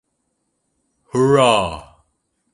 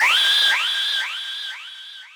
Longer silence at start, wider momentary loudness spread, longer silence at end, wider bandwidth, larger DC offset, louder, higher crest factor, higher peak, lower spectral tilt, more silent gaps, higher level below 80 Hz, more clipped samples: first, 1.15 s vs 0 s; second, 14 LU vs 20 LU; first, 0.7 s vs 0.05 s; second, 11.5 kHz vs over 20 kHz; neither; about the same, -16 LUFS vs -18 LUFS; first, 20 dB vs 14 dB; first, 0 dBFS vs -6 dBFS; first, -5 dB/octave vs 4.5 dB/octave; neither; first, -48 dBFS vs -90 dBFS; neither